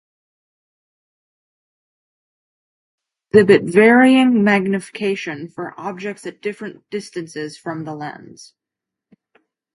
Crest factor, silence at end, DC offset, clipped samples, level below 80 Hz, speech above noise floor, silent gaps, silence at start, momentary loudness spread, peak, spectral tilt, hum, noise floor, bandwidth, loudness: 20 dB; 1.6 s; under 0.1%; under 0.1%; -62 dBFS; 68 dB; none; 3.35 s; 18 LU; 0 dBFS; -6 dB/octave; none; -85 dBFS; 11.5 kHz; -16 LUFS